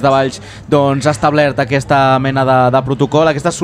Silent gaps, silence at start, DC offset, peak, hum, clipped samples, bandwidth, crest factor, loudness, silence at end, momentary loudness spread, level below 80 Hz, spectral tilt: none; 0 s; under 0.1%; 0 dBFS; none; under 0.1%; 12.5 kHz; 12 dB; -13 LUFS; 0 s; 5 LU; -42 dBFS; -6 dB/octave